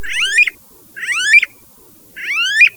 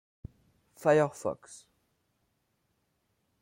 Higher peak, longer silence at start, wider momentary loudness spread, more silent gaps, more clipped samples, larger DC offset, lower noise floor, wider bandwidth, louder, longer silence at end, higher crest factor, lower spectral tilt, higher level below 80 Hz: first, 0 dBFS vs -12 dBFS; second, 0 s vs 0.8 s; second, 14 LU vs 20 LU; neither; neither; neither; second, -45 dBFS vs -77 dBFS; first, over 20 kHz vs 16 kHz; first, -12 LUFS vs -29 LUFS; second, 0.05 s vs 1.85 s; second, 16 dB vs 22 dB; second, 2.5 dB/octave vs -6 dB/octave; first, -54 dBFS vs -64 dBFS